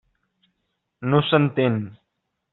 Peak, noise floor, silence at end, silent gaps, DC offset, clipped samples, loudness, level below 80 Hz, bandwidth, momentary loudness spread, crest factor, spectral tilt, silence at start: -4 dBFS; -77 dBFS; 0.6 s; none; under 0.1%; under 0.1%; -21 LUFS; -62 dBFS; 4.2 kHz; 13 LU; 20 dB; -5.5 dB/octave; 1 s